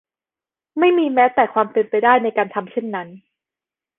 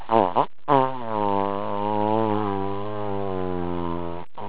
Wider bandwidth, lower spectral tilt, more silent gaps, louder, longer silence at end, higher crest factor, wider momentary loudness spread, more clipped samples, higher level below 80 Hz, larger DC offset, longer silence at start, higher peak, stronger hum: about the same, 4 kHz vs 4 kHz; second, -8.5 dB/octave vs -11 dB/octave; neither; first, -17 LUFS vs -25 LUFS; first, 0.8 s vs 0 s; about the same, 18 dB vs 22 dB; first, 13 LU vs 8 LU; neither; second, -66 dBFS vs -48 dBFS; second, under 0.1% vs 3%; first, 0.75 s vs 0 s; about the same, -2 dBFS vs -2 dBFS; neither